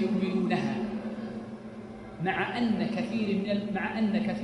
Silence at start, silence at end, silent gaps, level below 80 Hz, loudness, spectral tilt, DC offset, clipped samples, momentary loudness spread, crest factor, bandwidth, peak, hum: 0 s; 0 s; none; -60 dBFS; -30 LUFS; -7 dB/octave; under 0.1%; under 0.1%; 13 LU; 16 dB; 10.5 kHz; -14 dBFS; none